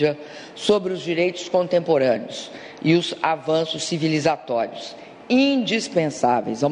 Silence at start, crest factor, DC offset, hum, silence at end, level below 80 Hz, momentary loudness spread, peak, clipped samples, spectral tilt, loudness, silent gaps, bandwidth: 0 s; 18 dB; under 0.1%; none; 0 s; -62 dBFS; 14 LU; -4 dBFS; under 0.1%; -5 dB/octave; -21 LUFS; none; 11 kHz